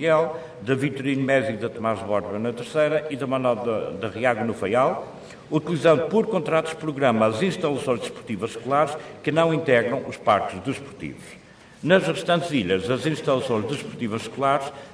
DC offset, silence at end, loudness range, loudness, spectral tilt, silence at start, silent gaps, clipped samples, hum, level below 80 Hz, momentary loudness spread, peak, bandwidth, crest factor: under 0.1%; 0 s; 2 LU; -23 LUFS; -6 dB/octave; 0 s; none; under 0.1%; none; -60 dBFS; 10 LU; -4 dBFS; 11 kHz; 20 dB